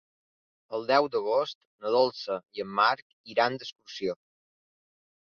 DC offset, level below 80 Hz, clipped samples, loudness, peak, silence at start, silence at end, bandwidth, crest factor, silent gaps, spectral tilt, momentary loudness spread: under 0.1%; -76 dBFS; under 0.1%; -28 LUFS; -10 dBFS; 0.7 s; 1.15 s; 6.8 kHz; 20 dB; 1.55-1.79 s, 3.02-3.24 s, 3.72-3.76 s; -4.5 dB/octave; 12 LU